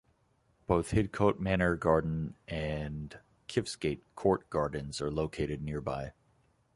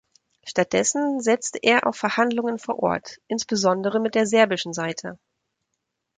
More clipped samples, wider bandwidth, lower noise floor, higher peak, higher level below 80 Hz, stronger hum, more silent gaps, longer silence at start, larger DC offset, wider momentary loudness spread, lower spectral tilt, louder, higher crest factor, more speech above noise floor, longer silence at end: neither; first, 11.5 kHz vs 9.6 kHz; second, -71 dBFS vs -79 dBFS; second, -10 dBFS vs -2 dBFS; first, -48 dBFS vs -66 dBFS; neither; neither; first, 0.7 s vs 0.45 s; neither; about the same, 11 LU vs 10 LU; first, -6.5 dB/octave vs -3.5 dB/octave; second, -33 LUFS vs -22 LUFS; about the same, 22 dB vs 20 dB; second, 39 dB vs 57 dB; second, 0.65 s vs 1.05 s